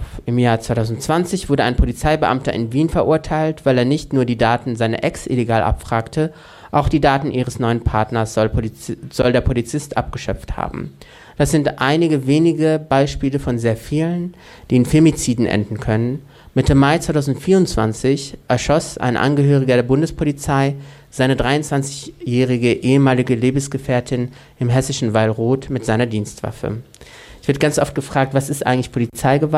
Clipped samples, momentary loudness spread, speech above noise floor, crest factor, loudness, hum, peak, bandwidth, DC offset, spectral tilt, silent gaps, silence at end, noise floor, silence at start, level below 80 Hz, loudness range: under 0.1%; 9 LU; 23 dB; 14 dB; -18 LUFS; none; -2 dBFS; 14.5 kHz; under 0.1%; -6 dB/octave; none; 0 s; -40 dBFS; 0 s; -32 dBFS; 3 LU